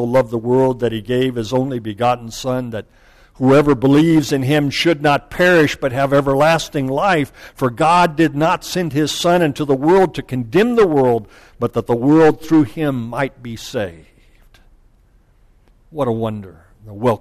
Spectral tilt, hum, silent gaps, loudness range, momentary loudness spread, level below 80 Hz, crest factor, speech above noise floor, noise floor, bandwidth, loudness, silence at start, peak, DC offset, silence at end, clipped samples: -6 dB/octave; none; none; 11 LU; 11 LU; -44 dBFS; 12 dB; 37 dB; -52 dBFS; 14 kHz; -16 LUFS; 0 s; -6 dBFS; under 0.1%; 0.05 s; under 0.1%